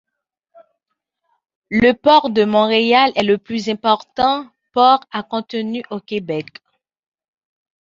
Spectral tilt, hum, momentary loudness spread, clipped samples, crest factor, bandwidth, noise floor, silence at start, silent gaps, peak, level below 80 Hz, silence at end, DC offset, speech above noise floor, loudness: -5.5 dB/octave; none; 12 LU; under 0.1%; 18 dB; 7.6 kHz; -77 dBFS; 1.7 s; none; -2 dBFS; -54 dBFS; 1.55 s; under 0.1%; 61 dB; -16 LUFS